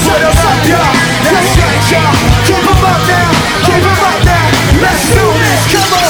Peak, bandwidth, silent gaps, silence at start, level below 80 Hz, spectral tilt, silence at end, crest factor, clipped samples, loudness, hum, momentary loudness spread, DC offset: 0 dBFS; over 20 kHz; none; 0 s; -20 dBFS; -4.5 dB/octave; 0 s; 8 dB; under 0.1%; -8 LUFS; none; 1 LU; under 0.1%